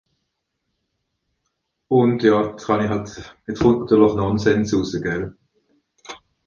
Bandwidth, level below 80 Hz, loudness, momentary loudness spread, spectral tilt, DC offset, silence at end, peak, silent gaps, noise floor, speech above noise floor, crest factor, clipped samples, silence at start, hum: 7.4 kHz; -46 dBFS; -19 LUFS; 19 LU; -7 dB/octave; under 0.1%; 0.3 s; -2 dBFS; none; -76 dBFS; 57 dB; 18 dB; under 0.1%; 1.9 s; none